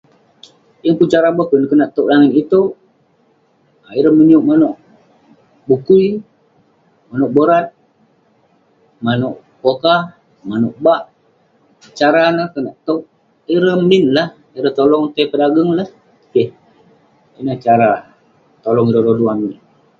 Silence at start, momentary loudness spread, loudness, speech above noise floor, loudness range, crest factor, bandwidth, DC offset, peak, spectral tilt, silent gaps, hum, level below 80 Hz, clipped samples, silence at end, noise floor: 0.85 s; 12 LU; -14 LUFS; 43 dB; 4 LU; 14 dB; 7.4 kHz; under 0.1%; 0 dBFS; -7.5 dB/octave; none; none; -58 dBFS; under 0.1%; 0.45 s; -56 dBFS